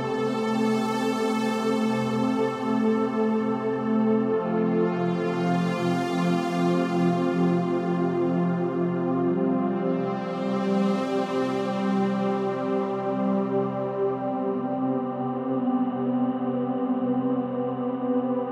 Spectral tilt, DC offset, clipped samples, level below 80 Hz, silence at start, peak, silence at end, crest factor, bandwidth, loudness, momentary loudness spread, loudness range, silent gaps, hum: -7.5 dB/octave; under 0.1%; under 0.1%; -72 dBFS; 0 s; -12 dBFS; 0 s; 14 dB; 12 kHz; -25 LUFS; 4 LU; 2 LU; none; none